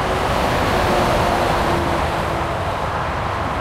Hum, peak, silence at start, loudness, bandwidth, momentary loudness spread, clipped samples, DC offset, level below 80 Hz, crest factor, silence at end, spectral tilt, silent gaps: none; -4 dBFS; 0 s; -19 LUFS; 16 kHz; 5 LU; under 0.1%; under 0.1%; -30 dBFS; 14 dB; 0 s; -5 dB/octave; none